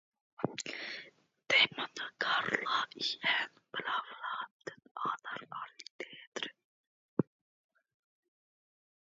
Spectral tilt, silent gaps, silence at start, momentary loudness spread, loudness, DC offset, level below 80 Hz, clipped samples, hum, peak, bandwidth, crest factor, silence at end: -0.5 dB/octave; 4.51-4.60 s, 4.91-4.95 s, 5.90-5.99 s, 6.27-6.32 s, 6.64-7.17 s; 0.4 s; 16 LU; -35 LUFS; under 0.1%; -84 dBFS; under 0.1%; none; -14 dBFS; 7.4 kHz; 24 dB; 1.8 s